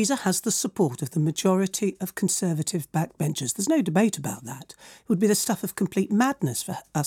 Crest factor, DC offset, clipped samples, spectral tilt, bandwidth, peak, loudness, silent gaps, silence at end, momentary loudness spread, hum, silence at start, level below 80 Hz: 16 dB; under 0.1%; under 0.1%; -4.5 dB/octave; 18.5 kHz; -10 dBFS; -25 LUFS; none; 0 s; 8 LU; none; 0 s; -66 dBFS